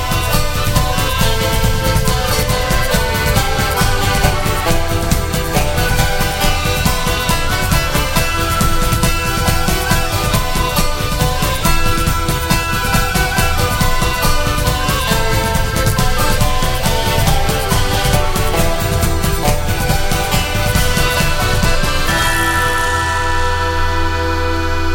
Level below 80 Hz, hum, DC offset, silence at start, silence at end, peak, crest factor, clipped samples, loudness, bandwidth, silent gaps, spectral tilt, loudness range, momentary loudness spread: -18 dBFS; none; under 0.1%; 0 s; 0 s; 0 dBFS; 14 dB; under 0.1%; -15 LUFS; 17 kHz; none; -4 dB/octave; 1 LU; 2 LU